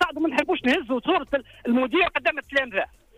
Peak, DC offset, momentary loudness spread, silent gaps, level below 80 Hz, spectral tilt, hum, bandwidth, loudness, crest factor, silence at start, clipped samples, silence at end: -10 dBFS; under 0.1%; 7 LU; none; -54 dBFS; -4.5 dB/octave; none; 15 kHz; -23 LUFS; 14 dB; 0 s; under 0.1%; 0.35 s